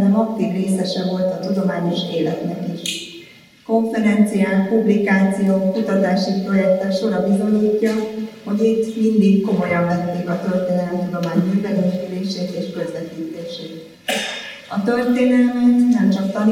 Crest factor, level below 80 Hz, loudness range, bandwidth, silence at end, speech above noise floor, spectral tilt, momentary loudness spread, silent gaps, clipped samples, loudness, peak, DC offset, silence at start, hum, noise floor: 16 dB; -62 dBFS; 5 LU; 15 kHz; 0 s; 26 dB; -6.5 dB/octave; 11 LU; none; under 0.1%; -19 LUFS; -2 dBFS; under 0.1%; 0 s; none; -44 dBFS